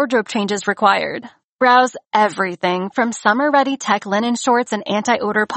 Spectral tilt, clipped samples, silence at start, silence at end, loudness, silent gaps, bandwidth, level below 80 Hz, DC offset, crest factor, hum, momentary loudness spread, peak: -4 dB/octave; under 0.1%; 0 s; 0 s; -17 LUFS; 1.44-1.59 s; 8.8 kHz; -66 dBFS; under 0.1%; 16 dB; none; 6 LU; -2 dBFS